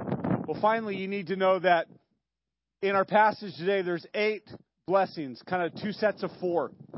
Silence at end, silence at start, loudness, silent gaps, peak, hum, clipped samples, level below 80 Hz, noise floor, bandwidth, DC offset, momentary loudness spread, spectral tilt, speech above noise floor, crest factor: 0 s; 0 s; -28 LUFS; none; -8 dBFS; none; under 0.1%; -66 dBFS; -89 dBFS; 5.8 kHz; under 0.1%; 9 LU; -10 dB/octave; 61 dB; 20 dB